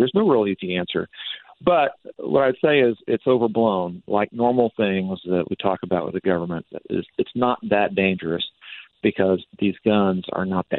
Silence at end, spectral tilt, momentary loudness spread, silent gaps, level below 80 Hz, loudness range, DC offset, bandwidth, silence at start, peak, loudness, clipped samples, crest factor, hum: 0 s; -10 dB/octave; 9 LU; none; -58 dBFS; 3 LU; under 0.1%; 4.3 kHz; 0 s; -2 dBFS; -22 LUFS; under 0.1%; 18 dB; none